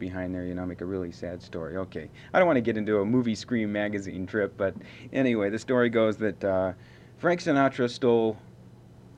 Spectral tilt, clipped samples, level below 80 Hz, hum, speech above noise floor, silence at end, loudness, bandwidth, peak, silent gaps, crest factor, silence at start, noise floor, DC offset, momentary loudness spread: -6.5 dB/octave; under 0.1%; -62 dBFS; none; 23 dB; 0.1 s; -27 LUFS; 9.8 kHz; -8 dBFS; none; 18 dB; 0 s; -50 dBFS; under 0.1%; 12 LU